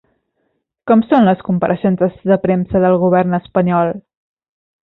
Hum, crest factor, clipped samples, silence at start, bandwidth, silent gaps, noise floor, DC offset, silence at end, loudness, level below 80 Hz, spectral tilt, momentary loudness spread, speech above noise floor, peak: none; 14 dB; under 0.1%; 0.85 s; 4.1 kHz; none; -68 dBFS; under 0.1%; 0.85 s; -14 LUFS; -48 dBFS; -11 dB/octave; 5 LU; 54 dB; -2 dBFS